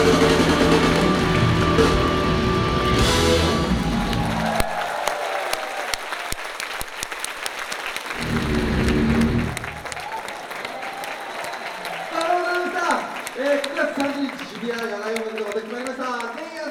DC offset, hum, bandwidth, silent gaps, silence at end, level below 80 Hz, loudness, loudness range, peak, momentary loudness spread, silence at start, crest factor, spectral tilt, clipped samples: under 0.1%; none; 18 kHz; none; 0 s; -34 dBFS; -22 LUFS; 8 LU; -2 dBFS; 12 LU; 0 s; 20 dB; -5 dB/octave; under 0.1%